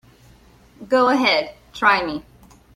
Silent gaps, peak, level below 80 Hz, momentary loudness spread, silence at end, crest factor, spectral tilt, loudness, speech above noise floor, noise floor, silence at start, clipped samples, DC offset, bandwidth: none; -2 dBFS; -54 dBFS; 15 LU; 0.55 s; 20 dB; -4 dB/octave; -18 LUFS; 32 dB; -50 dBFS; 0.8 s; under 0.1%; under 0.1%; 14 kHz